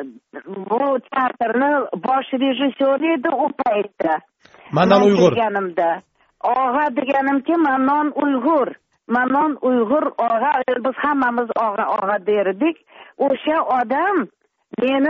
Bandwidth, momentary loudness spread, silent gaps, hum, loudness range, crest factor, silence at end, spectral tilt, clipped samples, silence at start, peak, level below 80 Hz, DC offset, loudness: 7 kHz; 6 LU; none; none; 2 LU; 18 dB; 0 s; -4 dB/octave; under 0.1%; 0 s; 0 dBFS; -62 dBFS; under 0.1%; -19 LUFS